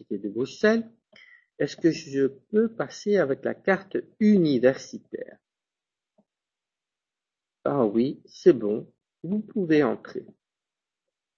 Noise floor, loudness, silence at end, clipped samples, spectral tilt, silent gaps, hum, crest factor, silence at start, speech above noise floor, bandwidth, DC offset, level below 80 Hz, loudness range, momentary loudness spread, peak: -90 dBFS; -25 LUFS; 1.15 s; under 0.1%; -7 dB/octave; none; none; 20 dB; 0.1 s; 65 dB; 7.4 kHz; under 0.1%; -68 dBFS; 7 LU; 17 LU; -6 dBFS